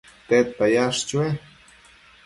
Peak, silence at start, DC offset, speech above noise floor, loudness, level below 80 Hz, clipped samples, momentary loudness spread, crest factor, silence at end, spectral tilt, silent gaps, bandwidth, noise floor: -6 dBFS; 0.3 s; under 0.1%; 31 dB; -22 LUFS; -58 dBFS; under 0.1%; 7 LU; 18 dB; 0.85 s; -4.5 dB/octave; none; 11.5 kHz; -52 dBFS